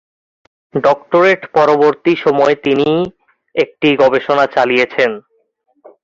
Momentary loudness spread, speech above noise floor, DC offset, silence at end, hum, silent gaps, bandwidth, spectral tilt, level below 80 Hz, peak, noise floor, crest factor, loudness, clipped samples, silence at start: 7 LU; 48 dB; under 0.1%; 0.85 s; none; none; 7.6 kHz; -6 dB/octave; -56 dBFS; 0 dBFS; -61 dBFS; 14 dB; -13 LUFS; under 0.1%; 0.75 s